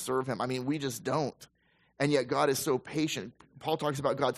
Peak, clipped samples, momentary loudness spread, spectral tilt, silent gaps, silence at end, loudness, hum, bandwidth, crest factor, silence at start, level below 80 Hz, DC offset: -12 dBFS; under 0.1%; 8 LU; -5 dB/octave; none; 0 s; -31 LUFS; none; 14.5 kHz; 18 dB; 0 s; -68 dBFS; under 0.1%